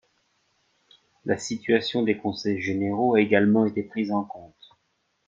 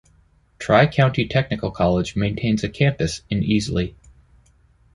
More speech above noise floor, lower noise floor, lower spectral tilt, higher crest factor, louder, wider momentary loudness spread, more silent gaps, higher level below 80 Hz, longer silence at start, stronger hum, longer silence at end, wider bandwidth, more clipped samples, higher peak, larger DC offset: first, 49 dB vs 37 dB; first, -73 dBFS vs -57 dBFS; about the same, -5.5 dB/octave vs -6.5 dB/octave; about the same, 22 dB vs 20 dB; second, -24 LUFS vs -20 LUFS; about the same, 10 LU vs 9 LU; neither; second, -68 dBFS vs -40 dBFS; first, 1.25 s vs 0.6 s; neither; second, 0.8 s vs 1.05 s; second, 7.8 kHz vs 11.5 kHz; neither; about the same, -4 dBFS vs -2 dBFS; neither